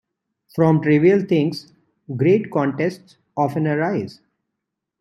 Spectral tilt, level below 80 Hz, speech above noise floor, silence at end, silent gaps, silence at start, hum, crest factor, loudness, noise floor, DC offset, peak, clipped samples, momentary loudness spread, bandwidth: -8.5 dB/octave; -64 dBFS; 62 dB; 0.85 s; none; 0.55 s; none; 16 dB; -19 LUFS; -81 dBFS; under 0.1%; -4 dBFS; under 0.1%; 17 LU; 12 kHz